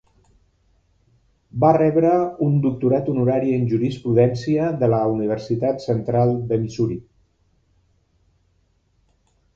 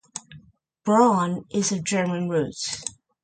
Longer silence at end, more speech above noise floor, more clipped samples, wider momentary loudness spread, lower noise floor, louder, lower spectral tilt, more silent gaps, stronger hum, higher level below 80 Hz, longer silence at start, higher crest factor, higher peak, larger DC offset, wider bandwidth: first, 2.55 s vs 0.35 s; first, 45 dB vs 31 dB; neither; second, 7 LU vs 16 LU; first, -64 dBFS vs -53 dBFS; first, -20 LUFS vs -23 LUFS; first, -9 dB/octave vs -4.5 dB/octave; neither; neither; first, -52 dBFS vs -62 dBFS; first, 1.55 s vs 0.15 s; about the same, 20 dB vs 18 dB; first, -2 dBFS vs -6 dBFS; neither; second, 7.6 kHz vs 9.4 kHz